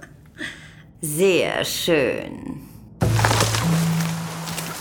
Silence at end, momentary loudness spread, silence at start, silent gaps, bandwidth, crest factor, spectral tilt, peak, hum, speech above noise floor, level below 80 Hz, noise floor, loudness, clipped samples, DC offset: 0 s; 15 LU; 0 s; none; 20 kHz; 22 dB; -4.5 dB/octave; 0 dBFS; none; 23 dB; -42 dBFS; -43 dBFS; -21 LUFS; under 0.1%; under 0.1%